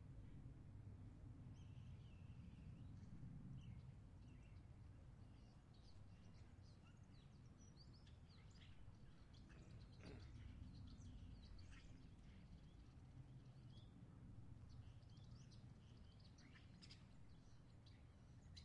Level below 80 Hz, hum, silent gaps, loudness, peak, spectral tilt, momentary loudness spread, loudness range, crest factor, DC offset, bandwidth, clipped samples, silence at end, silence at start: -68 dBFS; none; none; -64 LUFS; -46 dBFS; -6.5 dB/octave; 6 LU; 5 LU; 16 dB; under 0.1%; 9.6 kHz; under 0.1%; 0 s; 0 s